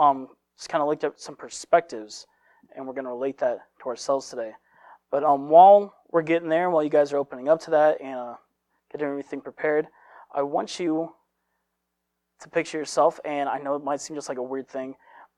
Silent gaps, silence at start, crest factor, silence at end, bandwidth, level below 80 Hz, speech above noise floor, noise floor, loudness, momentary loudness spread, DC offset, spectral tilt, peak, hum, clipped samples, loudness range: none; 0 s; 22 dB; 0.45 s; 11 kHz; -76 dBFS; 56 dB; -80 dBFS; -24 LUFS; 17 LU; under 0.1%; -4.5 dB/octave; -4 dBFS; none; under 0.1%; 10 LU